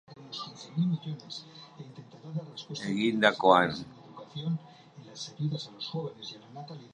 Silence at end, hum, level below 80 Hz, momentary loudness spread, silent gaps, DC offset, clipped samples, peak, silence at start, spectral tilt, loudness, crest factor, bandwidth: 0.05 s; none; -72 dBFS; 24 LU; none; under 0.1%; under 0.1%; -6 dBFS; 0.1 s; -5.5 dB/octave; -30 LUFS; 26 dB; 10 kHz